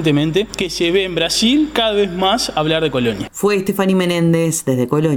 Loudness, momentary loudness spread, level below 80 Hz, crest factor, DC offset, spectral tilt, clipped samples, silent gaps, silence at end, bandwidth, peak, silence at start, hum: -16 LUFS; 4 LU; -42 dBFS; 16 dB; under 0.1%; -4.5 dB/octave; under 0.1%; none; 0 s; 18 kHz; 0 dBFS; 0 s; none